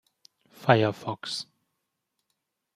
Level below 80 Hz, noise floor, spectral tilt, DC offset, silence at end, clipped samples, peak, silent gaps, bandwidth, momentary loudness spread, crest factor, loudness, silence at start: -70 dBFS; -81 dBFS; -5.5 dB/octave; under 0.1%; 1.35 s; under 0.1%; -4 dBFS; none; 14 kHz; 13 LU; 28 dB; -27 LUFS; 0.6 s